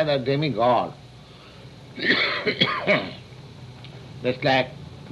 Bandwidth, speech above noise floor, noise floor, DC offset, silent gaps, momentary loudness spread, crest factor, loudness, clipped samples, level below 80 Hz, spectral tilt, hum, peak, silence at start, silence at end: 12 kHz; 23 dB; -45 dBFS; under 0.1%; none; 22 LU; 20 dB; -22 LUFS; under 0.1%; -56 dBFS; -6 dB/octave; none; -6 dBFS; 0 s; 0 s